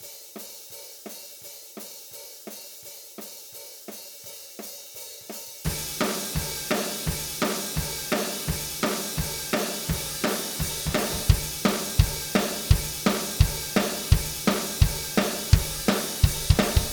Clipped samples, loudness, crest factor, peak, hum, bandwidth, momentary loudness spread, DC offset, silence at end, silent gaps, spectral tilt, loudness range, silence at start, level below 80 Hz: under 0.1%; -26 LUFS; 24 dB; -2 dBFS; none; over 20 kHz; 16 LU; under 0.1%; 0 s; none; -4 dB/octave; 15 LU; 0 s; -34 dBFS